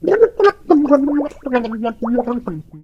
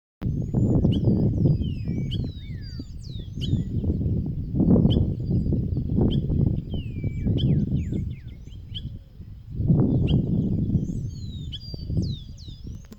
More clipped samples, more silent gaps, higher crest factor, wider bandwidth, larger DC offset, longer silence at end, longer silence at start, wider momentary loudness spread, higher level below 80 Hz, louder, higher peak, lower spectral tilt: neither; neither; about the same, 16 dB vs 18 dB; about the same, 7.4 kHz vs 7.4 kHz; neither; about the same, 0.05 s vs 0 s; second, 0 s vs 0.2 s; second, 10 LU vs 16 LU; second, -46 dBFS vs -34 dBFS; first, -16 LUFS vs -25 LUFS; first, 0 dBFS vs -6 dBFS; second, -7.5 dB/octave vs -9.5 dB/octave